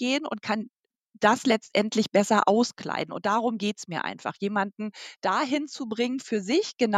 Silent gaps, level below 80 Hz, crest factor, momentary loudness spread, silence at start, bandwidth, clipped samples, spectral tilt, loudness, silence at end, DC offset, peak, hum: 0.77-0.84 s; -76 dBFS; 20 dB; 10 LU; 0 s; 13 kHz; under 0.1%; -4.5 dB/octave; -26 LUFS; 0 s; under 0.1%; -6 dBFS; none